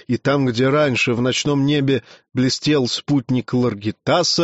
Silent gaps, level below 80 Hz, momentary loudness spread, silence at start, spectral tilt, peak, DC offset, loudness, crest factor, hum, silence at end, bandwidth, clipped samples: none; -54 dBFS; 5 LU; 0.1 s; -4.5 dB/octave; -6 dBFS; under 0.1%; -19 LUFS; 12 dB; none; 0 s; 8 kHz; under 0.1%